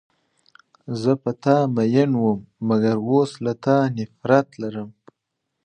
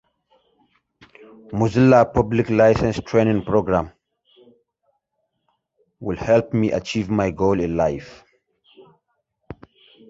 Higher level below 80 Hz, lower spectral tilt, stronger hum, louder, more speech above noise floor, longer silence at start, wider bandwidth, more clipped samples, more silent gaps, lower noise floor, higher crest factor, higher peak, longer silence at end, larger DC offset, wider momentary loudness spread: second, -64 dBFS vs -44 dBFS; about the same, -8 dB/octave vs -7.5 dB/octave; neither; about the same, -21 LUFS vs -19 LUFS; about the same, 58 dB vs 56 dB; second, 0.9 s vs 1.5 s; first, 9.6 kHz vs 7.8 kHz; neither; neither; first, -79 dBFS vs -75 dBFS; about the same, 20 dB vs 20 dB; about the same, -2 dBFS vs -2 dBFS; first, 0.75 s vs 0.55 s; neither; second, 12 LU vs 18 LU